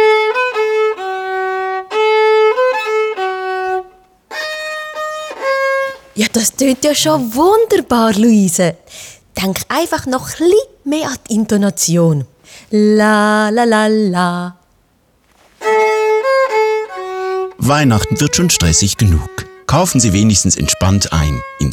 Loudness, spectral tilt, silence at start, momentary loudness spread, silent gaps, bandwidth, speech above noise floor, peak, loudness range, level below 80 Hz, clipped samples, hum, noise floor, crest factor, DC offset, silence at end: -14 LUFS; -4.5 dB/octave; 0 s; 11 LU; none; 19.5 kHz; 43 dB; -2 dBFS; 4 LU; -34 dBFS; under 0.1%; none; -55 dBFS; 12 dB; under 0.1%; 0 s